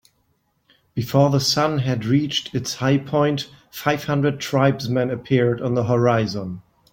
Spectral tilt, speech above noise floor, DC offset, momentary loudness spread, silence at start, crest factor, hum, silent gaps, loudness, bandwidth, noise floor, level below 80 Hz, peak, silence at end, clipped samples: -5.5 dB/octave; 47 dB; under 0.1%; 10 LU; 0.95 s; 18 dB; none; none; -20 LUFS; 17 kHz; -67 dBFS; -54 dBFS; -2 dBFS; 0.35 s; under 0.1%